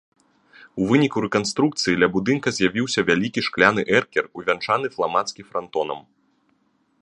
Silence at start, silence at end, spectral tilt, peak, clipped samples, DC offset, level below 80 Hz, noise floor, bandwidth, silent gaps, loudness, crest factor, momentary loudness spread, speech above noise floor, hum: 0.6 s; 1 s; -4.5 dB/octave; 0 dBFS; under 0.1%; under 0.1%; -58 dBFS; -65 dBFS; 10.5 kHz; none; -21 LUFS; 22 dB; 9 LU; 44 dB; none